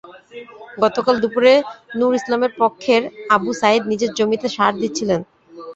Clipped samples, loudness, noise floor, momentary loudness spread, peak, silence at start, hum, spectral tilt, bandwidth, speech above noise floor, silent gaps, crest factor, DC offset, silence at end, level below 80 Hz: under 0.1%; -18 LUFS; -38 dBFS; 20 LU; -2 dBFS; 0.1 s; none; -4.5 dB/octave; 8 kHz; 21 dB; none; 16 dB; under 0.1%; 0 s; -60 dBFS